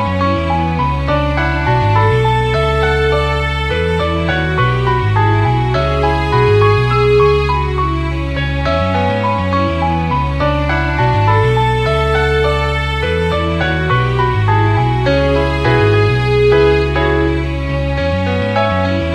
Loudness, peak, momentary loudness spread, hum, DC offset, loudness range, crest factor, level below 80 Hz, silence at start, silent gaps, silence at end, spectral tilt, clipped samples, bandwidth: -14 LUFS; 0 dBFS; 5 LU; none; under 0.1%; 2 LU; 14 dB; -22 dBFS; 0 s; none; 0 s; -7 dB/octave; under 0.1%; 10.5 kHz